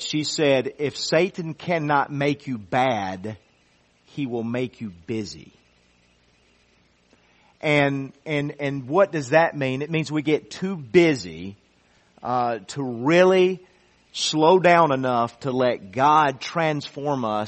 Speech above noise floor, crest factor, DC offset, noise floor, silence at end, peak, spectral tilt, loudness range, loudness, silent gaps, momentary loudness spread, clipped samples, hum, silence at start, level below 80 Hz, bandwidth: 39 dB; 20 dB; under 0.1%; -61 dBFS; 0 s; -2 dBFS; -5.5 dB/octave; 13 LU; -22 LUFS; none; 14 LU; under 0.1%; none; 0 s; -62 dBFS; 8.4 kHz